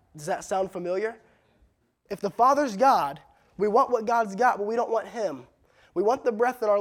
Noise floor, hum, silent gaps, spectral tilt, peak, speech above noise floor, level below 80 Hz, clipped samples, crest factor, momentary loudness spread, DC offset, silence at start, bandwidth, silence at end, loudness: -65 dBFS; none; none; -5 dB/octave; -10 dBFS; 41 dB; -66 dBFS; under 0.1%; 16 dB; 12 LU; under 0.1%; 0.15 s; 16.5 kHz; 0 s; -25 LUFS